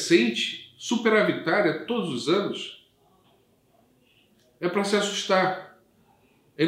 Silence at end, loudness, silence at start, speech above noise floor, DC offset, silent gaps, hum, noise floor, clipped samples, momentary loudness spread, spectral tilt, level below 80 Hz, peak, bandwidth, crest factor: 0 s; -25 LUFS; 0 s; 39 dB; under 0.1%; none; none; -63 dBFS; under 0.1%; 11 LU; -4 dB/octave; -76 dBFS; -6 dBFS; 15 kHz; 20 dB